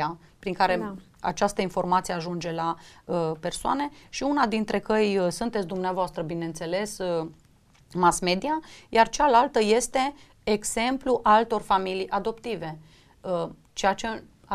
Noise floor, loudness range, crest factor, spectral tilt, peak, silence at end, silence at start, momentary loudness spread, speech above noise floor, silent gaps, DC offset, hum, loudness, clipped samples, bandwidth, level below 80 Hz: -56 dBFS; 5 LU; 20 dB; -4 dB/octave; -6 dBFS; 0 s; 0 s; 13 LU; 31 dB; none; under 0.1%; none; -26 LUFS; under 0.1%; 15.5 kHz; -52 dBFS